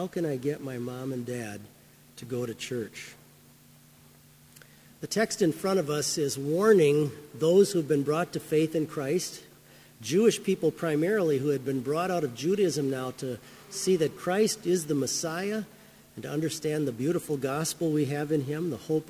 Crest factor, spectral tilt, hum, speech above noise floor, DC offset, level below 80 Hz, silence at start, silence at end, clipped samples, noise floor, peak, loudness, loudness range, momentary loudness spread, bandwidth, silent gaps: 20 dB; -5 dB/octave; none; 28 dB; under 0.1%; -68 dBFS; 0 s; 0 s; under 0.1%; -56 dBFS; -8 dBFS; -28 LUFS; 12 LU; 13 LU; 16 kHz; none